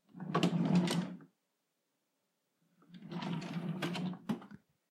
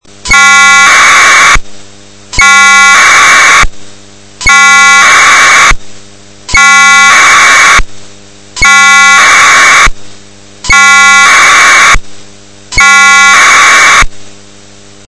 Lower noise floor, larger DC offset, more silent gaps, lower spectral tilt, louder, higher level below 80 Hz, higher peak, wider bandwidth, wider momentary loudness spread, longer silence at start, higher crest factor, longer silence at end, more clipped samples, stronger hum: first, -84 dBFS vs -34 dBFS; neither; neither; first, -6 dB/octave vs 0.5 dB/octave; second, -37 LUFS vs -1 LUFS; second, -80 dBFS vs -22 dBFS; second, -18 dBFS vs 0 dBFS; first, 13 kHz vs 11 kHz; first, 16 LU vs 7 LU; about the same, 0.15 s vs 0.25 s; first, 20 dB vs 4 dB; second, 0.35 s vs 0.7 s; second, under 0.1% vs 20%; neither